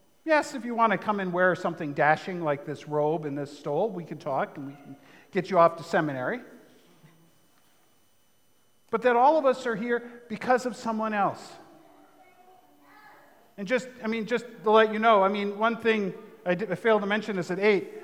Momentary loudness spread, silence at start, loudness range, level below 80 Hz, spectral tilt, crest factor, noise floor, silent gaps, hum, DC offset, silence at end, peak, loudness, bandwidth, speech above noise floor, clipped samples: 13 LU; 0.25 s; 9 LU; -80 dBFS; -6 dB/octave; 20 dB; -68 dBFS; none; none; under 0.1%; 0 s; -6 dBFS; -26 LUFS; 15 kHz; 42 dB; under 0.1%